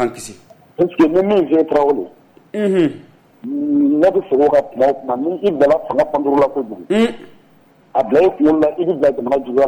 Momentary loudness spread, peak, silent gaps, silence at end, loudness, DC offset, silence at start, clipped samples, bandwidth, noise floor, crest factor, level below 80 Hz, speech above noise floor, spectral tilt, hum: 9 LU; -4 dBFS; none; 0 s; -16 LUFS; under 0.1%; 0 s; under 0.1%; 18 kHz; -50 dBFS; 10 dB; -52 dBFS; 35 dB; -6.5 dB/octave; none